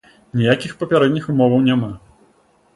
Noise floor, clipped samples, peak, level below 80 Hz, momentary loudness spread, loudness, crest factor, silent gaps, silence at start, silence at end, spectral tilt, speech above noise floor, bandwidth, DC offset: -56 dBFS; under 0.1%; 0 dBFS; -54 dBFS; 12 LU; -17 LUFS; 18 dB; none; 0.35 s; 0.8 s; -7.5 dB/octave; 40 dB; 11.5 kHz; under 0.1%